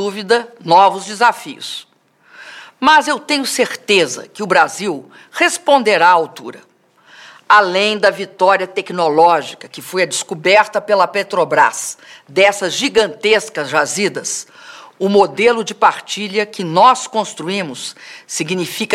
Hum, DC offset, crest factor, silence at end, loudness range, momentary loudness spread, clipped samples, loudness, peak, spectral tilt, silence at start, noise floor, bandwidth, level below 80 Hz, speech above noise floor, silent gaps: none; under 0.1%; 16 dB; 0 s; 2 LU; 15 LU; under 0.1%; -14 LUFS; 0 dBFS; -2.5 dB/octave; 0 s; -50 dBFS; 16 kHz; -64 dBFS; 35 dB; none